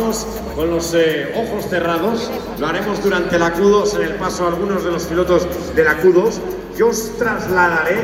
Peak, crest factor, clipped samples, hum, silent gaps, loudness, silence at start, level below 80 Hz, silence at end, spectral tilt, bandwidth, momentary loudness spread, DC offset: -2 dBFS; 16 dB; under 0.1%; none; none; -17 LUFS; 0 s; -38 dBFS; 0 s; -4.5 dB/octave; 16.5 kHz; 8 LU; under 0.1%